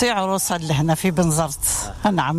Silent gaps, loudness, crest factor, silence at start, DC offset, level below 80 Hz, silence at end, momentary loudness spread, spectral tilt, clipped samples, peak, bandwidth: none; -20 LUFS; 14 dB; 0 s; under 0.1%; -40 dBFS; 0 s; 2 LU; -4.5 dB/octave; under 0.1%; -6 dBFS; 16 kHz